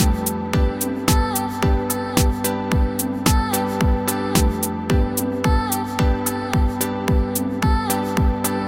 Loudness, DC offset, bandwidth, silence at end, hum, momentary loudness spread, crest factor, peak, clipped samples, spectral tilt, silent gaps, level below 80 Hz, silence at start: -20 LUFS; under 0.1%; 17 kHz; 0 s; none; 3 LU; 18 dB; -2 dBFS; under 0.1%; -5 dB/octave; none; -24 dBFS; 0 s